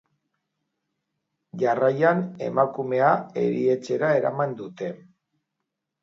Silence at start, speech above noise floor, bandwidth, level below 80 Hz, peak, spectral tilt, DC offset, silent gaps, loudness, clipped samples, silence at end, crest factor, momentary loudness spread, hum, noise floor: 1.55 s; 59 dB; 7.6 kHz; -74 dBFS; -6 dBFS; -7.5 dB/octave; under 0.1%; none; -23 LUFS; under 0.1%; 1.05 s; 20 dB; 12 LU; none; -82 dBFS